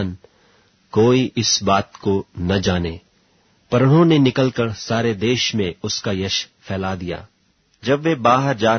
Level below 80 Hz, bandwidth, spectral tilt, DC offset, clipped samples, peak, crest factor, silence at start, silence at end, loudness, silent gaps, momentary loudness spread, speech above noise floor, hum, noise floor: -48 dBFS; 6.6 kHz; -5 dB/octave; under 0.1%; under 0.1%; -2 dBFS; 18 dB; 0 s; 0 s; -19 LUFS; none; 13 LU; 41 dB; none; -59 dBFS